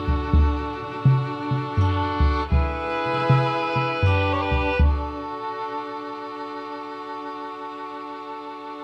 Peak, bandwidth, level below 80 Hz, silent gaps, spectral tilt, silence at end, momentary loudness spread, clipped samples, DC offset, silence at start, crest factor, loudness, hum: -8 dBFS; 6.4 kHz; -28 dBFS; none; -8 dB/octave; 0 s; 13 LU; under 0.1%; under 0.1%; 0 s; 16 dB; -24 LUFS; none